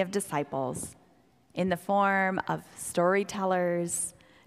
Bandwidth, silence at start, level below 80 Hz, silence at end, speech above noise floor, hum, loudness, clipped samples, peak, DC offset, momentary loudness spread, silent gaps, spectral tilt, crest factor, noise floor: 15.5 kHz; 0 s; -66 dBFS; 0.35 s; 34 dB; none; -29 LUFS; under 0.1%; -12 dBFS; under 0.1%; 10 LU; none; -4.5 dB/octave; 18 dB; -63 dBFS